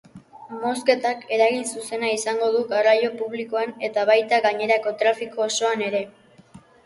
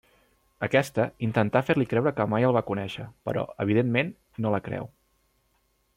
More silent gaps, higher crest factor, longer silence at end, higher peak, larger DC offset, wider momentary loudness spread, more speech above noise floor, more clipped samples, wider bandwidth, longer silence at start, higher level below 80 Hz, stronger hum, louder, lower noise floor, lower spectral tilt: neither; about the same, 18 dB vs 18 dB; second, 0.3 s vs 1.1 s; first, -4 dBFS vs -8 dBFS; neither; about the same, 9 LU vs 11 LU; second, 27 dB vs 44 dB; neither; second, 11.5 kHz vs 16 kHz; second, 0.15 s vs 0.6 s; second, -72 dBFS vs -62 dBFS; neither; first, -22 LUFS vs -26 LUFS; second, -49 dBFS vs -70 dBFS; second, -2.5 dB/octave vs -7.5 dB/octave